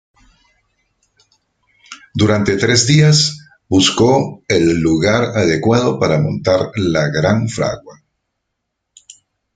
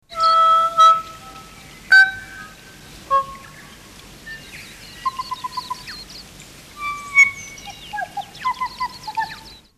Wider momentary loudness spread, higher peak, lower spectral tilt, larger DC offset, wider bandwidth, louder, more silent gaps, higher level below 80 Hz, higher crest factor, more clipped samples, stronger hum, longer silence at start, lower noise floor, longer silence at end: second, 7 LU vs 25 LU; about the same, 0 dBFS vs -2 dBFS; first, -5 dB/octave vs -1 dB/octave; neither; second, 9.4 kHz vs 14 kHz; first, -14 LUFS vs -17 LUFS; neither; first, -46 dBFS vs -52 dBFS; about the same, 16 dB vs 18 dB; neither; neither; first, 1.9 s vs 0.1 s; first, -75 dBFS vs -42 dBFS; first, 1.65 s vs 0.3 s